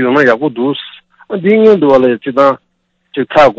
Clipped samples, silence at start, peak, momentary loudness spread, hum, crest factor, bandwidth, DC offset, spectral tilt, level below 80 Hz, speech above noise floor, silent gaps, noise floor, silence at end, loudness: 0.7%; 0 s; 0 dBFS; 15 LU; none; 10 dB; 8 kHz; under 0.1%; -7 dB/octave; -50 dBFS; 30 dB; none; -40 dBFS; 0.05 s; -10 LUFS